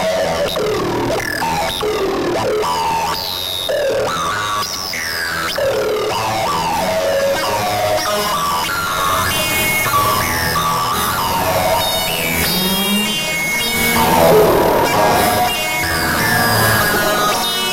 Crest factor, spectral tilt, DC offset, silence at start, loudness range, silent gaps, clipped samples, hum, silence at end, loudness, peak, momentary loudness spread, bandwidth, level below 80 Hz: 16 dB; -3 dB/octave; under 0.1%; 0 s; 5 LU; none; under 0.1%; none; 0 s; -15 LUFS; 0 dBFS; 6 LU; 17 kHz; -38 dBFS